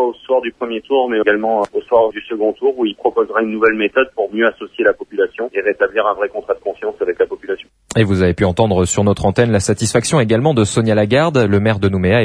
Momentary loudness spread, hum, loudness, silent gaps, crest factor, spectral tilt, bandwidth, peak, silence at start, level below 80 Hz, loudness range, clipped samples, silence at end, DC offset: 7 LU; none; -16 LUFS; none; 16 dB; -5.5 dB/octave; 11 kHz; 0 dBFS; 0 s; -42 dBFS; 4 LU; under 0.1%; 0 s; under 0.1%